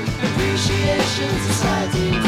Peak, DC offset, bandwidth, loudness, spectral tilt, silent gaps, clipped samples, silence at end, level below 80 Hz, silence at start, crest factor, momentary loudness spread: -6 dBFS; under 0.1%; 15.5 kHz; -19 LUFS; -4.5 dB/octave; none; under 0.1%; 0 s; -34 dBFS; 0 s; 14 dB; 2 LU